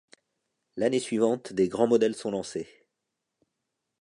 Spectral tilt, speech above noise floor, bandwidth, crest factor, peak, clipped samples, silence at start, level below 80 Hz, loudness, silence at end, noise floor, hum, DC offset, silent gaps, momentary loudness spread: -5.5 dB/octave; 58 dB; 11.5 kHz; 20 dB; -10 dBFS; under 0.1%; 0.75 s; -68 dBFS; -27 LUFS; 1.35 s; -84 dBFS; none; under 0.1%; none; 14 LU